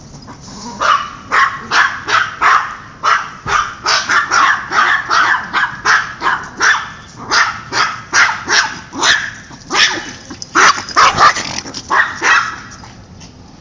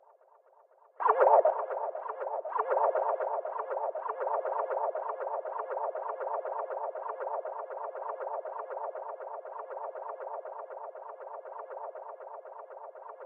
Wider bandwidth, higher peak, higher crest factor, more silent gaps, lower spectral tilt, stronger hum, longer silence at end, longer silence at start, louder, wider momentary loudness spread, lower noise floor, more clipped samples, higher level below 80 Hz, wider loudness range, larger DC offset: first, 7.6 kHz vs 3.5 kHz; first, 0 dBFS vs -10 dBFS; second, 14 dB vs 24 dB; neither; about the same, -0.5 dB/octave vs 0.5 dB/octave; neither; about the same, 0.05 s vs 0 s; second, 0 s vs 1 s; first, -13 LUFS vs -33 LUFS; second, 13 LU vs 16 LU; second, -36 dBFS vs -62 dBFS; neither; first, -44 dBFS vs under -90 dBFS; second, 2 LU vs 13 LU; neither